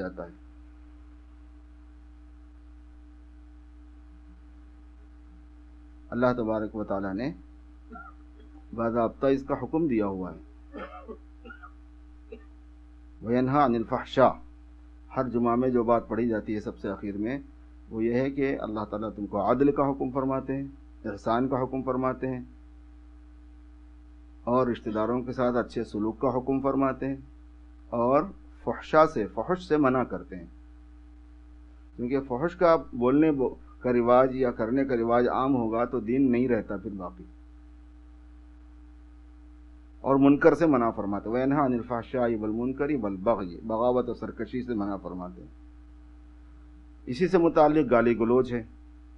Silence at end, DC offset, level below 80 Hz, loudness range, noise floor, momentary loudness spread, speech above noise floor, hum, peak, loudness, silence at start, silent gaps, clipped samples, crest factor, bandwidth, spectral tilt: 0 s; under 0.1%; -50 dBFS; 8 LU; -49 dBFS; 19 LU; 23 dB; none; -4 dBFS; -27 LUFS; 0 s; none; under 0.1%; 24 dB; 7.6 kHz; -8.5 dB/octave